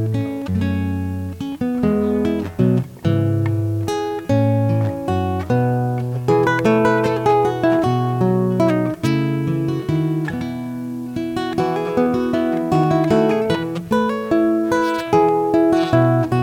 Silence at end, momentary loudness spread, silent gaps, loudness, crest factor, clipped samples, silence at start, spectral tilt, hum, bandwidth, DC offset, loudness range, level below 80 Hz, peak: 0 s; 7 LU; none; -19 LUFS; 14 dB; under 0.1%; 0 s; -8 dB/octave; none; 16.5 kHz; under 0.1%; 4 LU; -46 dBFS; -4 dBFS